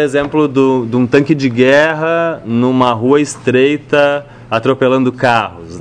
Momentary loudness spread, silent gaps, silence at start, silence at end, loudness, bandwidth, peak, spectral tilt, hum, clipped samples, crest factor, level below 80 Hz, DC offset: 5 LU; none; 0 s; 0 s; -12 LUFS; 10 kHz; 0 dBFS; -6 dB/octave; none; 0.1%; 12 dB; -48 dBFS; under 0.1%